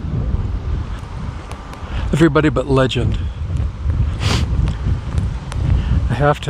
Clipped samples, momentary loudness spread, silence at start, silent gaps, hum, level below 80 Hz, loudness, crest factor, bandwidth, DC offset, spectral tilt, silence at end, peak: under 0.1%; 13 LU; 0 s; none; none; -24 dBFS; -19 LUFS; 18 dB; 11 kHz; under 0.1%; -7 dB/octave; 0 s; 0 dBFS